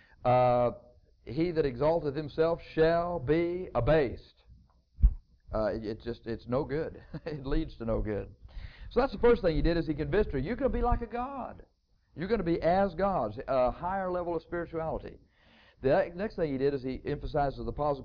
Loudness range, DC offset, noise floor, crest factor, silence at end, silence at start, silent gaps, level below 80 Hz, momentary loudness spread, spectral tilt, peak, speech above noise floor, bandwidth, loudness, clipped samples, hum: 5 LU; under 0.1%; -61 dBFS; 20 dB; 0 s; 0.2 s; none; -40 dBFS; 12 LU; -9.5 dB/octave; -10 dBFS; 32 dB; 5.4 kHz; -31 LUFS; under 0.1%; none